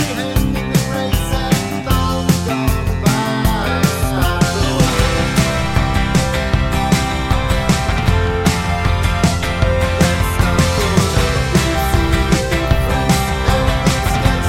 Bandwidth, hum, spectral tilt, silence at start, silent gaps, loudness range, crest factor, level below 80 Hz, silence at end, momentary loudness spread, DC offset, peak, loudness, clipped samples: 16.5 kHz; none; -5 dB/octave; 0 s; none; 2 LU; 14 dB; -22 dBFS; 0 s; 3 LU; under 0.1%; 0 dBFS; -16 LUFS; under 0.1%